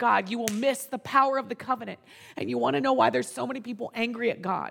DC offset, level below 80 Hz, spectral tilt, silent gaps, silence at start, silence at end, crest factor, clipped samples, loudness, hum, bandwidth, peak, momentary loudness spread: under 0.1%; -74 dBFS; -4 dB/octave; none; 0 s; 0 s; 20 dB; under 0.1%; -27 LUFS; none; 19 kHz; -8 dBFS; 12 LU